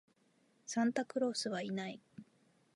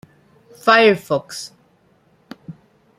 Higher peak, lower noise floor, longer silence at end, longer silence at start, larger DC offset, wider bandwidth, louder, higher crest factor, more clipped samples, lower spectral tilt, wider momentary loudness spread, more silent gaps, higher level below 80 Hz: second, -22 dBFS vs 0 dBFS; first, -73 dBFS vs -57 dBFS; about the same, 0.5 s vs 0.45 s; about the same, 0.65 s vs 0.65 s; neither; second, 11.5 kHz vs 15 kHz; second, -38 LUFS vs -15 LUFS; about the same, 18 dB vs 20 dB; neither; about the same, -4 dB/octave vs -4 dB/octave; second, 20 LU vs 26 LU; neither; second, -86 dBFS vs -66 dBFS